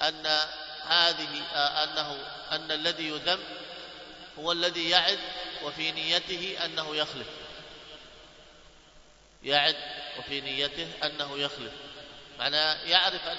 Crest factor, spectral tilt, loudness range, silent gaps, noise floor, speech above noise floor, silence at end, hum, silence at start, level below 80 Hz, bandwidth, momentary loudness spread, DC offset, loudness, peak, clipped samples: 26 dB; -2 dB/octave; 4 LU; none; -56 dBFS; 26 dB; 0 s; none; 0 s; -62 dBFS; 8 kHz; 20 LU; under 0.1%; -28 LUFS; -4 dBFS; under 0.1%